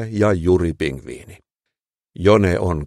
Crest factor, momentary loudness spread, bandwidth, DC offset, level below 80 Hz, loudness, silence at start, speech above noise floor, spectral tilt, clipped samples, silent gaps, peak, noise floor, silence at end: 18 dB; 19 LU; 12.5 kHz; under 0.1%; -38 dBFS; -18 LUFS; 0 s; 64 dB; -7.5 dB/octave; under 0.1%; none; 0 dBFS; -82 dBFS; 0 s